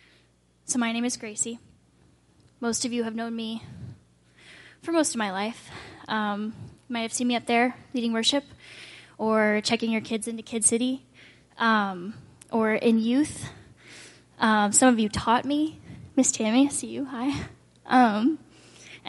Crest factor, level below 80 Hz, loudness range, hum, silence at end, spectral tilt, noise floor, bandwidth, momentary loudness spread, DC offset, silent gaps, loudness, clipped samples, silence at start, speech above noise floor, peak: 20 dB; -60 dBFS; 7 LU; none; 0 s; -3 dB/octave; -63 dBFS; 11.5 kHz; 21 LU; under 0.1%; none; -25 LUFS; under 0.1%; 0.7 s; 38 dB; -6 dBFS